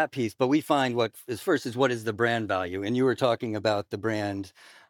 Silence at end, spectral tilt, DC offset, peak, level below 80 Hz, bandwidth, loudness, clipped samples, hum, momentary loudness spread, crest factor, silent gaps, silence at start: 0.4 s; -5.5 dB/octave; under 0.1%; -8 dBFS; -74 dBFS; 19 kHz; -27 LUFS; under 0.1%; none; 6 LU; 20 dB; none; 0 s